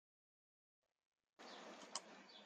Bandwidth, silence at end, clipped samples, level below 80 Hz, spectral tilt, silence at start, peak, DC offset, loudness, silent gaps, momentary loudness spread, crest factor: 10 kHz; 0 s; under 0.1%; under -90 dBFS; -1 dB/octave; 1.4 s; -28 dBFS; under 0.1%; -55 LUFS; none; 9 LU; 32 dB